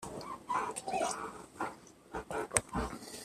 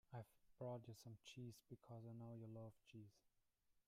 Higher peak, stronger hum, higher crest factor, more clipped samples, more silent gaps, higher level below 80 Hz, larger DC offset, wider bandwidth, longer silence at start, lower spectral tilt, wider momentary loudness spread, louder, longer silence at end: first, -8 dBFS vs -42 dBFS; neither; first, 32 dB vs 16 dB; neither; neither; first, -54 dBFS vs -86 dBFS; neither; about the same, 14.5 kHz vs 15.5 kHz; about the same, 0 s vs 0.1 s; second, -3 dB/octave vs -6.5 dB/octave; first, 13 LU vs 10 LU; first, -38 LUFS vs -59 LUFS; about the same, 0 s vs 0.1 s